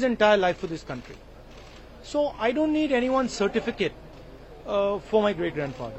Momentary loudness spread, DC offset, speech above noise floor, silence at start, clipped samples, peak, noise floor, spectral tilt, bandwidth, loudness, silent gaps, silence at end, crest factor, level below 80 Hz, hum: 24 LU; under 0.1%; 20 dB; 0 s; under 0.1%; -8 dBFS; -45 dBFS; -5 dB/octave; 8.4 kHz; -25 LUFS; none; 0 s; 18 dB; -48 dBFS; none